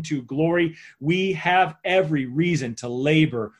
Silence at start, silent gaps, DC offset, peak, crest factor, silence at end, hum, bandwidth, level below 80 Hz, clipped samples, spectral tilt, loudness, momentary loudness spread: 0 s; none; under 0.1%; -6 dBFS; 16 dB; 0.1 s; none; 10.5 kHz; -58 dBFS; under 0.1%; -6 dB/octave; -22 LUFS; 7 LU